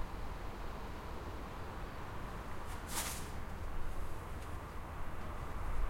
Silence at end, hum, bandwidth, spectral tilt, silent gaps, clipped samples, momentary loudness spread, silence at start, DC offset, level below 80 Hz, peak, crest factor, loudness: 0 s; none; 16.5 kHz; -4 dB/octave; none; under 0.1%; 6 LU; 0 s; under 0.1%; -44 dBFS; -24 dBFS; 16 dB; -45 LUFS